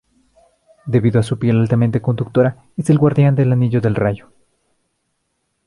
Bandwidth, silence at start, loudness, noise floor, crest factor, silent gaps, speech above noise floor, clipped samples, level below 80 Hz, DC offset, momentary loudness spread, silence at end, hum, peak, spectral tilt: 11.5 kHz; 0.85 s; -16 LUFS; -70 dBFS; 16 dB; none; 55 dB; under 0.1%; -48 dBFS; under 0.1%; 7 LU; 1.5 s; none; -2 dBFS; -9 dB/octave